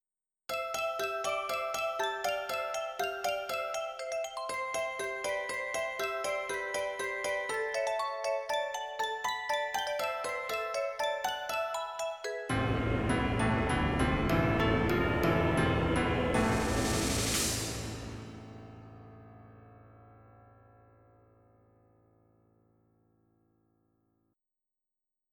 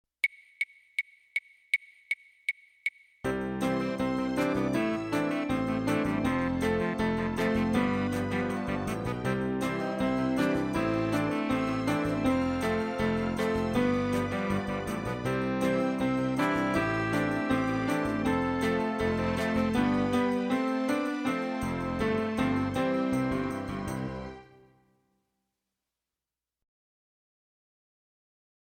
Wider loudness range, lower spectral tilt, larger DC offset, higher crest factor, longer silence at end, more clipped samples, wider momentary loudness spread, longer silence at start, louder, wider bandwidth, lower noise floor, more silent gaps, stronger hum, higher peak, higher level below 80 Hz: about the same, 6 LU vs 5 LU; second, -4.5 dB/octave vs -6.5 dB/octave; neither; about the same, 18 dB vs 16 dB; first, 4.85 s vs 4.25 s; neither; about the same, 8 LU vs 7 LU; first, 0.5 s vs 0.25 s; about the same, -32 LUFS vs -30 LUFS; first, 19.5 kHz vs 15 kHz; about the same, -89 dBFS vs under -90 dBFS; neither; neither; about the same, -14 dBFS vs -14 dBFS; about the same, -48 dBFS vs -50 dBFS